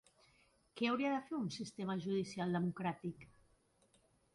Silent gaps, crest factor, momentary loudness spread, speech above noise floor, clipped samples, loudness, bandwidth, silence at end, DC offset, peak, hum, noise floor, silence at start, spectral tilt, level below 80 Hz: none; 18 dB; 10 LU; 34 dB; under 0.1%; -40 LUFS; 11.5 kHz; 1.1 s; under 0.1%; -24 dBFS; none; -74 dBFS; 0.75 s; -6 dB/octave; -76 dBFS